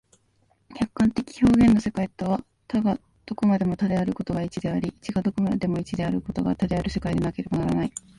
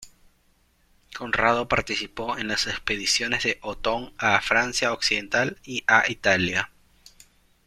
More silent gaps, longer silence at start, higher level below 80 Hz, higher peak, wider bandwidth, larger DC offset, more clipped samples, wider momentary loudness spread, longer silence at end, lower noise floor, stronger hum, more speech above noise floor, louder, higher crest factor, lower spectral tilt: neither; first, 0.7 s vs 0 s; first, -44 dBFS vs -50 dBFS; second, -8 dBFS vs -2 dBFS; second, 11.5 kHz vs 15.5 kHz; neither; neither; about the same, 9 LU vs 8 LU; second, 0.2 s vs 1 s; about the same, -65 dBFS vs -64 dBFS; neither; about the same, 42 dB vs 39 dB; about the same, -25 LUFS vs -23 LUFS; second, 16 dB vs 24 dB; first, -7.5 dB/octave vs -2.5 dB/octave